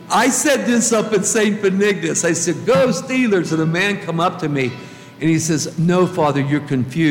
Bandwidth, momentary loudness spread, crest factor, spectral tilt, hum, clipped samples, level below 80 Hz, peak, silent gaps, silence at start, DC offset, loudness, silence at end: 17.5 kHz; 5 LU; 12 dB; -4.5 dB/octave; none; under 0.1%; -58 dBFS; -4 dBFS; none; 0 s; under 0.1%; -17 LUFS; 0 s